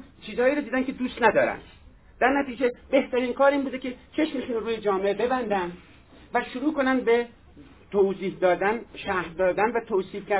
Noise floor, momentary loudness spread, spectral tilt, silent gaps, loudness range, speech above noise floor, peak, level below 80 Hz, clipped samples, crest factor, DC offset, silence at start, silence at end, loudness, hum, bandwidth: -50 dBFS; 8 LU; -9 dB/octave; none; 2 LU; 25 dB; -4 dBFS; -54 dBFS; under 0.1%; 22 dB; under 0.1%; 0 s; 0 s; -25 LUFS; none; 4 kHz